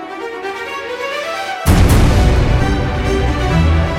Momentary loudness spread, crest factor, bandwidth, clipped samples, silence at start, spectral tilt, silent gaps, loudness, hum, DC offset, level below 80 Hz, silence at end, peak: 12 LU; 12 dB; 16.5 kHz; under 0.1%; 0 s; -6 dB/octave; none; -15 LUFS; none; under 0.1%; -18 dBFS; 0 s; 0 dBFS